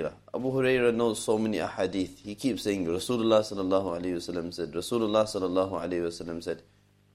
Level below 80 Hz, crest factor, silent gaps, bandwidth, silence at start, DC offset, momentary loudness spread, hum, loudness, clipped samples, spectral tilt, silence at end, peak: -60 dBFS; 20 dB; none; 15.5 kHz; 0 s; under 0.1%; 11 LU; none; -29 LUFS; under 0.1%; -5 dB/octave; 0.55 s; -10 dBFS